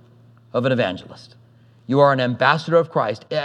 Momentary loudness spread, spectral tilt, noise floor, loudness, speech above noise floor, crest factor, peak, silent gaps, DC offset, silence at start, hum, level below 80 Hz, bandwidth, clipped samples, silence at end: 8 LU; -7 dB/octave; -50 dBFS; -19 LUFS; 31 dB; 20 dB; -2 dBFS; none; under 0.1%; 0.55 s; none; -68 dBFS; 9.8 kHz; under 0.1%; 0 s